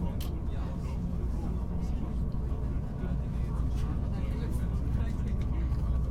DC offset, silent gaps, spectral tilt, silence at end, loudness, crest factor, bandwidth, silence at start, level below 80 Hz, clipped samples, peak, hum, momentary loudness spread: under 0.1%; none; -8.5 dB/octave; 0 s; -34 LUFS; 12 dB; 14 kHz; 0 s; -32 dBFS; under 0.1%; -18 dBFS; none; 3 LU